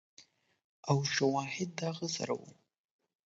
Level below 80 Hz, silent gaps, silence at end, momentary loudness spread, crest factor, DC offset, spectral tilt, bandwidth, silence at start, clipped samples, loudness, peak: -78 dBFS; 0.64-0.83 s; 0.75 s; 9 LU; 22 dB; under 0.1%; -4.5 dB/octave; 8 kHz; 0.2 s; under 0.1%; -34 LUFS; -16 dBFS